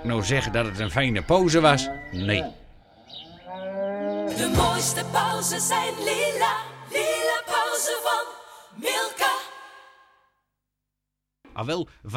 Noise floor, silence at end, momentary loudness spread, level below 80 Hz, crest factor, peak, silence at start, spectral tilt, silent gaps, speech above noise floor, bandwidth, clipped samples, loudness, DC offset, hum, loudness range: -83 dBFS; 0 s; 17 LU; -44 dBFS; 24 dB; -2 dBFS; 0 s; -3.5 dB/octave; none; 59 dB; 17.5 kHz; under 0.1%; -24 LUFS; under 0.1%; 50 Hz at -55 dBFS; 6 LU